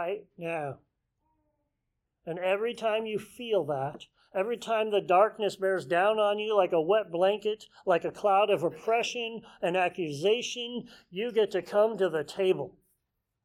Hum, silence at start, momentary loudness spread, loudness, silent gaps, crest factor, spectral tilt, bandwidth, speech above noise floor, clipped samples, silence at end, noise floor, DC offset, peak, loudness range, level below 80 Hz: none; 0 s; 12 LU; -29 LUFS; none; 18 dB; -4.5 dB/octave; 14 kHz; 54 dB; under 0.1%; 0.75 s; -82 dBFS; under 0.1%; -10 dBFS; 6 LU; -74 dBFS